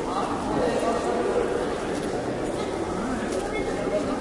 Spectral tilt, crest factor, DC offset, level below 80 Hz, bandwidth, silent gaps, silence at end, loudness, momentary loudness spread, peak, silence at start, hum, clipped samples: -5.5 dB/octave; 14 dB; under 0.1%; -44 dBFS; 11.5 kHz; none; 0 s; -27 LUFS; 4 LU; -12 dBFS; 0 s; none; under 0.1%